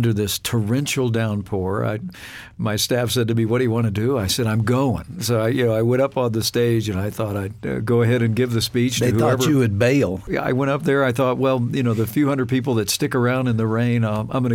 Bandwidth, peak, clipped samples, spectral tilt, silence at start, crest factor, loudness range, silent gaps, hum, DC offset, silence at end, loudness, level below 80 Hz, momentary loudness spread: 17 kHz; -6 dBFS; under 0.1%; -5.5 dB/octave; 0 s; 14 dB; 3 LU; none; none; under 0.1%; 0 s; -20 LUFS; -48 dBFS; 7 LU